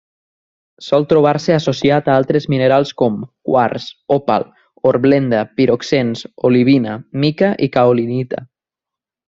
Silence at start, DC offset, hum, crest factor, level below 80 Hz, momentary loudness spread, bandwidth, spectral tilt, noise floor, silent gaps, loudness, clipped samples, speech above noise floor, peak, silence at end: 0.8 s; under 0.1%; none; 14 dB; -54 dBFS; 9 LU; 7.6 kHz; -7 dB/octave; -86 dBFS; none; -15 LUFS; under 0.1%; 72 dB; 0 dBFS; 0.9 s